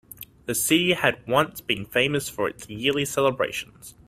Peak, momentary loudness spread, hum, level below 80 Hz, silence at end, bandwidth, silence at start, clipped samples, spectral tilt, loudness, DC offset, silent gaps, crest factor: -4 dBFS; 11 LU; none; -56 dBFS; 0.15 s; 16 kHz; 0.2 s; under 0.1%; -3.5 dB/octave; -24 LUFS; under 0.1%; none; 22 dB